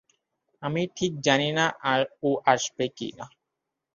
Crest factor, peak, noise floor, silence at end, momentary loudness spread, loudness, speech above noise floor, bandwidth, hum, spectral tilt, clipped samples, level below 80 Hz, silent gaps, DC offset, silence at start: 24 dB; -4 dBFS; -84 dBFS; 0.65 s; 14 LU; -25 LUFS; 58 dB; 7.4 kHz; none; -4 dB/octave; under 0.1%; -66 dBFS; none; under 0.1%; 0.6 s